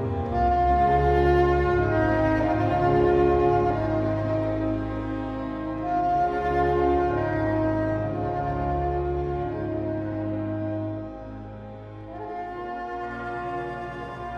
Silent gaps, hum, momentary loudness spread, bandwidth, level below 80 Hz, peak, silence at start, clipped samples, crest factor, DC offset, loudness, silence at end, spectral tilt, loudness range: none; none; 14 LU; 6.8 kHz; -36 dBFS; -8 dBFS; 0 s; under 0.1%; 16 dB; under 0.1%; -25 LUFS; 0 s; -9 dB/octave; 11 LU